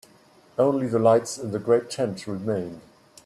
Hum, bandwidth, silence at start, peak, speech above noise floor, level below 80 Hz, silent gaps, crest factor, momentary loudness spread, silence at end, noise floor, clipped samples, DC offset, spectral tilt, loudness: none; 13 kHz; 0.6 s; -6 dBFS; 32 dB; -66 dBFS; none; 18 dB; 11 LU; 0.45 s; -55 dBFS; under 0.1%; under 0.1%; -6 dB/octave; -24 LUFS